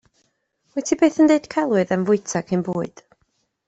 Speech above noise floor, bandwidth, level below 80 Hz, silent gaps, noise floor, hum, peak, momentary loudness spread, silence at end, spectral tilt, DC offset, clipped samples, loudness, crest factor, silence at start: 50 dB; 8.2 kHz; -62 dBFS; none; -69 dBFS; none; -4 dBFS; 12 LU; 0.8 s; -6 dB/octave; under 0.1%; under 0.1%; -20 LUFS; 18 dB; 0.75 s